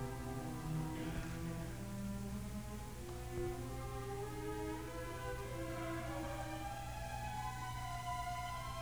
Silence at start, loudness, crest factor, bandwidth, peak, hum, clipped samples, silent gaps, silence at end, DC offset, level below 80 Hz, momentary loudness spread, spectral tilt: 0 s; -45 LUFS; 14 dB; over 20 kHz; -30 dBFS; 60 Hz at -50 dBFS; under 0.1%; none; 0 s; 0.1%; -52 dBFS; 3 LU; -5.5 dB/octave